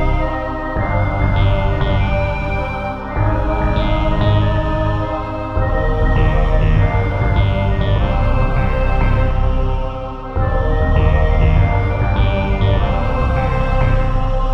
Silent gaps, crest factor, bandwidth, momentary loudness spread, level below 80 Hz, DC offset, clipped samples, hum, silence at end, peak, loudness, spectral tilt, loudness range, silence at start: none; 14 dB; 5.8 kHz; 6 LU; -18 dBFS; under 0.1%; under 0.1%; none; 0 s; -2 dBFS; -17 LUFS; -8.5 dB/octave; 2 LU; 0 s